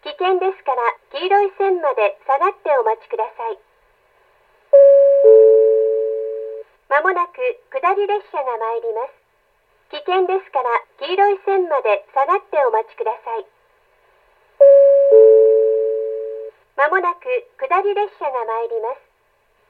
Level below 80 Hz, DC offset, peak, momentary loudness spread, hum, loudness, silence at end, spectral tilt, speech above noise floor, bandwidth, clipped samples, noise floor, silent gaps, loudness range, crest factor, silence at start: -72 dBFS; under 0.1%; 0 dBFS; 18 LU; none; -16 LUFS; 0.75 s; -4 dB/octave; 42 dB; 4.8 kHz; under 0.1%; -61 dBFS; none; 8 LU; 16 dB; 0.05 s